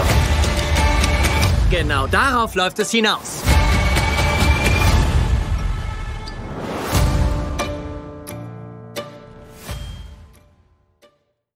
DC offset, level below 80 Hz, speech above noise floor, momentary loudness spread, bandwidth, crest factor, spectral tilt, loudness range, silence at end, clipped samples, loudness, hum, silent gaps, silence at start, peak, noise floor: under 0.1%; -22 dBFS; 42 dB; 16 LU; 16 kHz; 18 dB; -4.5 dB/octave; 16 LU; 1.3 s; under 0.1%; -18 LUFS; none; none; 0 s; -2 dBFS; -60 dBFS